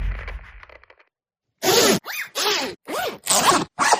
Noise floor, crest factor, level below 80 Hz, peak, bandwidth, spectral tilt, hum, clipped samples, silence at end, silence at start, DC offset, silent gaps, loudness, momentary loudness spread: -82 dBFS; 20 dB; -38 dBFS; -2 dBFS; 15.5 kHz; -2 dB/octave; none; under 0.1%; 0 s; 0 s; under 0.1%; none; -20 LUFS; 16 LU